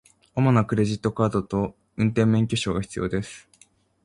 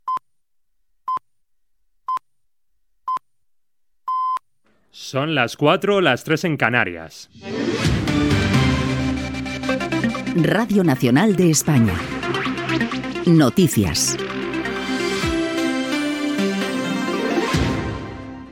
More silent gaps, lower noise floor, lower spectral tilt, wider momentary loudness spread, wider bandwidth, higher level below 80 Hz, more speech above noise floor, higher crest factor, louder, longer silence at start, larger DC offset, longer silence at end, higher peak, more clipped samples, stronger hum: neither; second, -59 dBFS vs -79 dBFS; first, -7 dB/octave vs -5 dB/octave; about the same, 11 LU vs 12 LU; second, 11 kHz vs 17.5 kHz; second, -48 dBFS vs -40 dBFS; second, 36 dB vs 62 dB; about the same, 18 dB vs 20 dB; second, -24 LUFS vs -20 LUFS; first, 0.35 s vs 0.05 s; neither; first, 0.65 s vs 0 s; second, -6 dBFS vs 0 dBFS; neither; neither